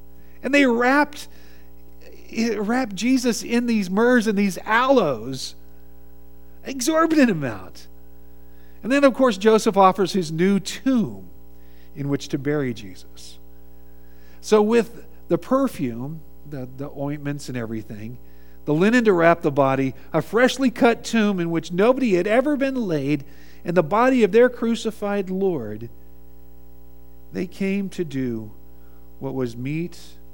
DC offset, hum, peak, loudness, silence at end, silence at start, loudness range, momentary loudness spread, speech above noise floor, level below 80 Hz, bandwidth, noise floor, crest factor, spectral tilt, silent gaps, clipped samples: 1%; none; -2 dBFS; -21 LUFS; 0.3 s; 0.45 s; 9 LU; 17 LU; 27 dB; -50 dBFS; 18 kHz; -48 dBFS; 20 dB; -5.5 dB/octave; none; under 0.1%